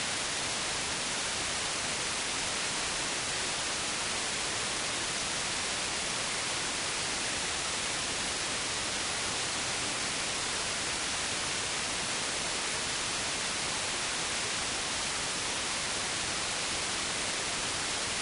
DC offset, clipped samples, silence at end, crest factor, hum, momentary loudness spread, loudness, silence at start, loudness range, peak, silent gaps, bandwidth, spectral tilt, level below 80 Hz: under 0.1%; under 0.1%; 0 s; 14 dB; none; 0 LU; -31 LUFS; 0 s; 0 LU; -18 dBFS; none; 11 kHz; -0.5 dB/octave; -56 dBFS